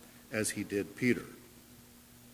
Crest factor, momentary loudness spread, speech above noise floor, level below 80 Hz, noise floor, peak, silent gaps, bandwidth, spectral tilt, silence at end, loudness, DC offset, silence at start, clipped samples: 22 dB; 23 LU; 23 dB; -66 dBFS; -57 dBFS; -16 dBFS; none; 16 kHz; -4.5 dB/octave; 0 s; -34 LUFS; under 0.1%; 0 s; under 0.1%